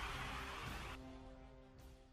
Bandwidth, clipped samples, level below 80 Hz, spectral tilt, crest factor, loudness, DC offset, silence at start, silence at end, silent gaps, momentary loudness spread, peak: 15.5 kHz; under 0.1%; -56 dBFS; -4 dB/octave; 18 dB; -49 LUFS; under 0.1%; 0 s; 0 s; none; 15 LU; -32 dBFS